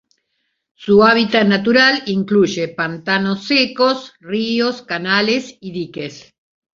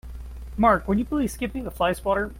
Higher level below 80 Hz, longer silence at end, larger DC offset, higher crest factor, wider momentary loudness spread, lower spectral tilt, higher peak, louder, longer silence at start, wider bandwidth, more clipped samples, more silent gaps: second, -56 dBFS vs -38 dBFS; first, 0.55 s vs 0 s; neither; about the same, 16 dB vs 18 dB; about the same, 15 LU vs 17 LU; about the same, -5 dB/octave vs -6 dB/octave; first, 0 dBFS vs -6 dBFS; first, -15 LUFS vs -24 LUFS; first, 0.8 s vs 0.05 s; second, 7.4 kHz vs 16.5 kHz; neither; neither